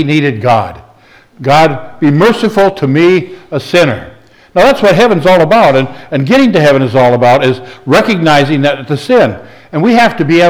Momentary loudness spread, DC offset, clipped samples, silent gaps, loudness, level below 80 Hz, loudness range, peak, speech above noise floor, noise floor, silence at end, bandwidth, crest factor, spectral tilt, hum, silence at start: 10 LU; under 0.1%; under 0.1%; none; -9 LUFS; -42 dBFS; 2 LU; 0 dBFS; 34 dB; -42 dBFS; 0 s; over 20 kHz; 8 dB; -6.5 dB/octave; none; 0 s